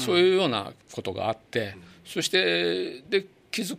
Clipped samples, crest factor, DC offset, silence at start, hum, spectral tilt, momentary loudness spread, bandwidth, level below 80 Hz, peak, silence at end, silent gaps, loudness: under 0.1%; 18 dB; under 0.1%; 0 s; none; -4 dB/octave; 14 LU; 15.5 kHz; -68 dBFS; -8 dBFS; 0 s; none; -26 LUFS